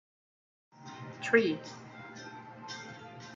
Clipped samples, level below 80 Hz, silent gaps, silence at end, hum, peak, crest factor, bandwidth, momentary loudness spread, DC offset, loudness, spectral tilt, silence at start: under 0.1%; -80 dBFS; none; 0 s; none; -10 dBFS; 26 dB; 7.8 kHz; 20 LU; under 0.1%; -32 LUFS; -5 dB/octave; 0.75 s